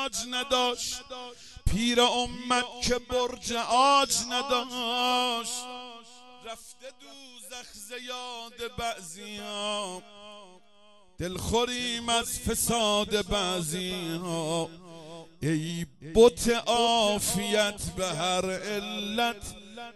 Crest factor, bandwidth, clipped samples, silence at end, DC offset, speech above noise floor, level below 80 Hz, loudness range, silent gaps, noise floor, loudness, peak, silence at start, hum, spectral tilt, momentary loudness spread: 22 dB; 13 kHz; under 0.1%; 0.05 s; 0.1%; 31 dB; -46 dBFS; 11 LU; none; -60 dBFS; -27 LUFS; -8 dBFS; 0 s; none; -3 dB/octave; 20 LU